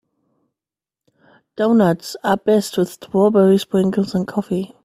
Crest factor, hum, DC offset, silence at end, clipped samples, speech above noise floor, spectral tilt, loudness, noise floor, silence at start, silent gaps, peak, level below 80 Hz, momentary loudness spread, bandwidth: 16 dB; none; under 0.1%; 0.2 s; under 0.1%; 72 dB; -6.5 dB/octave; -17 LUFS; -89 dBFS; 1.6 s; none; -2 dBFS; -58 dBFS; 8 LU; 15.5 kHz